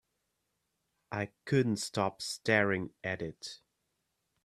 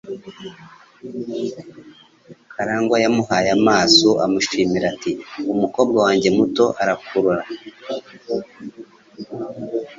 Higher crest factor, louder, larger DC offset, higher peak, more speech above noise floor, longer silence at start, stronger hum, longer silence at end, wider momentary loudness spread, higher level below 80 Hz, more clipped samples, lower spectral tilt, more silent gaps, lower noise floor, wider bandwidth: about the same, 24 dB vs 20 dB; second, -33 LUFS vs -18 LUFS; neither; second, -12 dBFS vs 0 dBFS; first, 49 dB vs 28 dB; first, 1.1 s vs 0.05 s; neither; first, 0.9 s vs 0.05 s; second, 14 LU vs 21 LU; second, -70 dBFS vs -56 dBFS; neither; about the same, -5 dB/octave vs -4 dB/octave; neither; first, -82 dBFS vs -46 dBFS; first, 14.5 kHz vs 7.8 kHz